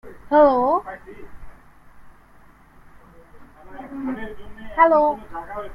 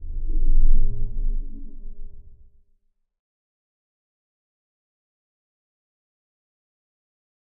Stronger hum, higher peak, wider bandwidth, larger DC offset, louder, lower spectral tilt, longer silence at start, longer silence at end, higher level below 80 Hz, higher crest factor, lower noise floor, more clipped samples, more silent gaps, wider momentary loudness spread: neither; about the same, -2 dBFS vs -4 dBFS; first, 5.6 kHz vs 0.5 kHz; neither; first, -19 LUFS vs -28 LUFS; second, -7.5 dB/octave vs -16.5 dB/octave; about the same, 0.05 s vs 0 s; second, 0 s vs 5.25 s; second, -48 dBFS vs -24 dBFS; about the same, 20 dB vs 16 dB; second, -49 dBFS vs -65 dBFS; neither; neither; first, 24 LU vs 21 LU